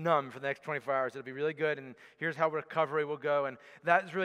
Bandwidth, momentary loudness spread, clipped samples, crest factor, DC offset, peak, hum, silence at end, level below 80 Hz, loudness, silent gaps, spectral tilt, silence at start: 11.5 kHz; 9 LU; under 0.1%; 22 dB; under 0.1%; -10 dBFS; none; 0 s; -86 dBFS; -33 LUFS; none; -6.5 dB/octave; 0 s